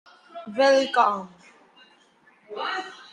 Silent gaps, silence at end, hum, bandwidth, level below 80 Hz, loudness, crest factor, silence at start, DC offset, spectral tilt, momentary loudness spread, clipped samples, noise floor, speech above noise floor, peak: none; 0.1 s; none; 10 kHz; -78 dBFS; -23 LUFS; 20 dB; 0.35 s; under 0.1%; -3 dB/octave; 23 LU; under 0.1%; -59 dBFS; 36 dB; -6 dBFS